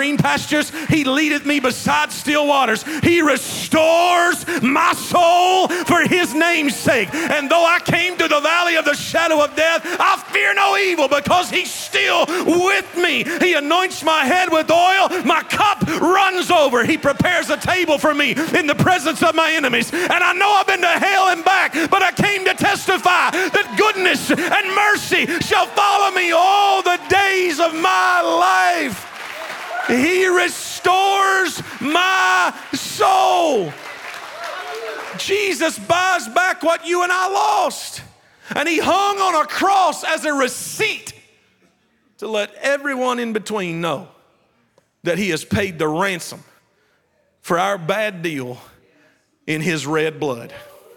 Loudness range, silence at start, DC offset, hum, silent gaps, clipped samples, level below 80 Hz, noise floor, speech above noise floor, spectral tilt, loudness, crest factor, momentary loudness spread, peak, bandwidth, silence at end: 8 LU; 0 s; under 0.1%; none; none; under 0.1%; -56 dBFS; -62 dBFS; 46 dB; -3.5 dB/octave; -16 LUFS; 14 dB; 10 LU; -4 dBFS; 19.5 kHz; 0.35 s